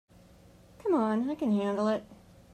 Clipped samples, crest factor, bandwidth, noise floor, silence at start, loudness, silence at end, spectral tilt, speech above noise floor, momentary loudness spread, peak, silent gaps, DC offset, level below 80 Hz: under 0.1%; 14 dB; 9.2 kHz; -56 dBFS; 0.85 s; -30 LUFS; 0.4 s; -7.5 dB/octave; 28 dB; 6 LU; -16 dBFS; none; under 0.1%; -64 dBFS